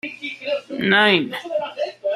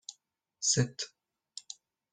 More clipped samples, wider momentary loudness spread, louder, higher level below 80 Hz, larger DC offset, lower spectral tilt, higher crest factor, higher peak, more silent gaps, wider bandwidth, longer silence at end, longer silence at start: neither; second, 13 LU vs 21 LU; first, -20 LUFS vs -31 LUFS; about the same, -66 dBFS vs -70 dBFS; neither; first, -5 dB/octave vs -3 dB/octave; about the same, 20 dB vs 22 dB; first, -2 dBFS vs -14 dBFS; neither; first, 14 kHz vs 10 kHz; second, 0 s vs 0.4 s; about the same, 0.05 s vs 0.1 s